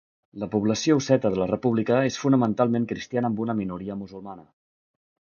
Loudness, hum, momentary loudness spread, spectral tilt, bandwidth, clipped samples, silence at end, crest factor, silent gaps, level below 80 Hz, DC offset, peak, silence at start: -24 LUFS; none; 14 LU; -6 dB/octave; 7.2 kHz; under 0.1%; 0.9 s; 20 dB; none; -58 dBFS; under 0.1%; -6 dBFS; 0.35 s